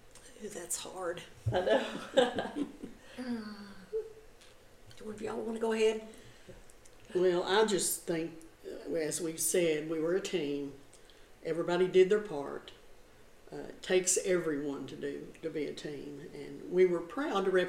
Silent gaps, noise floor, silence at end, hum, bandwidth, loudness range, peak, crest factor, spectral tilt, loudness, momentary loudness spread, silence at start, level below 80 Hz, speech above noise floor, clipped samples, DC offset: none; -57 dBFS; 0 s; none; 16.5 kHz; 6 LU; -14 dBFS; 20 dB; -4 dB/octave; -33 LUFS; 18 LU; 0.05 s; -62 dBFS; 24 dB; under 0.1%; under 0.1%